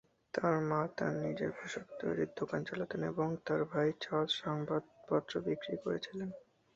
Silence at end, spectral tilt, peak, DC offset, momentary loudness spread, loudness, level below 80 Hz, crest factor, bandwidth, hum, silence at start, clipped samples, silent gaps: 0.35 s; -4.5 dB/octave; -18 dBFS; under 0.1%; 8 LU; -37 LUFS; -72 dBFS; 20 dB; 8 kHz; none; 0.35 s; under 0.1%; none